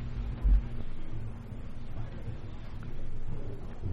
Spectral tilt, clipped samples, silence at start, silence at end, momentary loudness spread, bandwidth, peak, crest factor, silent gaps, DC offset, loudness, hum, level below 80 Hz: -8.5 dB/octave; under 0.1%; 0 s; 0 s; 14 LU; 4.6 kHz; -16 dBFS; 16 dB; none; under 0.1%; -38 LUFS; none; -34 dBFS